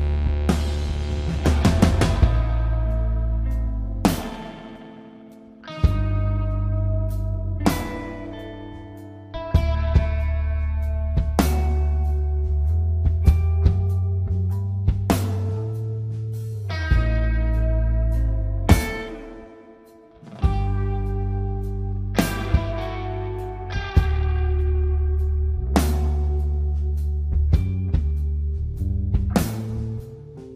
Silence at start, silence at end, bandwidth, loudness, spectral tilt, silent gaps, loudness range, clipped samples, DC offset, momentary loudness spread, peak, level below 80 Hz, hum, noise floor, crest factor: 0 s; 0 s; 15.5 kHz; -23 LUFS; -7 dB/octave; none; 4 LU; under 0.1%; under 0.1%; 14 LU; -2 dBFS; -24 dBFS; none; -48 dBFS; 20 dB